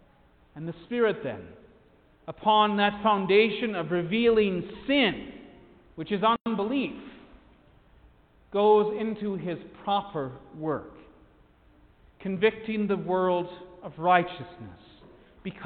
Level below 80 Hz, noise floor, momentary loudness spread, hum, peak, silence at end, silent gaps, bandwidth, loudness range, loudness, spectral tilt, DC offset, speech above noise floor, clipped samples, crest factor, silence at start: -60 dBFS; -60 dBFS; 19 LU; none; -6 dBFS; 0 s; none; 4.6 kHz; 7 LU; -26 LUFS; -9.5 dB/octave; under 0.1%; 33 dB; under 0.1%; 22 dB; 0.55 s